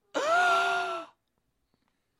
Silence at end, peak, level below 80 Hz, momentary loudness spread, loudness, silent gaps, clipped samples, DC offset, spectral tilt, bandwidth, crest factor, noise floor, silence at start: 1.15 s; -14 dBFS; -80 dBFS; 12 LU; -26 LUFS; none; under 0.1%; under 0.1%; -1 dB/octave; 13 kHz; 16 dB; -78 dBFS; 0.15 s